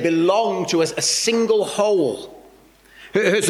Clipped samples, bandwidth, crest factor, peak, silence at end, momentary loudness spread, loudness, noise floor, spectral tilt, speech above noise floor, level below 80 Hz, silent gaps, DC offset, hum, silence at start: under 0.1%; 16 kHz; 14 dB; -4 dBFS; 0 s; 7 LU; -19 LUFS; -50 dBFS; -3 dB/octave; 31 dB; -62 dBFS; none; under 0.1%; none; 0 s